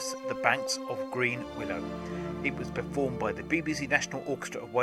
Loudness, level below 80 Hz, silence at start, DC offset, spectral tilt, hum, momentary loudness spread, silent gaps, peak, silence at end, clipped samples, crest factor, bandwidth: -31 LUFS; -56 dBFS; 0 s; under 0.1%; -4 dB/octave; none; 8 LU; none; -8 dBFS; 0 s; under 0.1%; 24 dB; 15 kHz